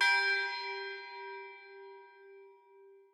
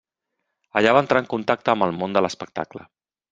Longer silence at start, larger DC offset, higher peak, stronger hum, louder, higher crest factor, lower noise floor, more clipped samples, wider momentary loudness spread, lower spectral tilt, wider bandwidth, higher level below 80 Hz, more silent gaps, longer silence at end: second, 0 s vs 0.75 s; neither; second, -16 dBFS vs 0 dBFS; neither; second, -34 LUFS vs -21 LUFS; about the same, 20 dB vs 22 dB; second, -60 dBFS vs -79 dBFS; neither; first, 27 LU vs 13 LU; second, 2 dB/octave vs -5.5 dB/octave; first, 15.5 kHz vs 7.8 kHz; second, under -90 dBFS vs -62 dBFS; neither; second, 0.15 s vs 0.5 s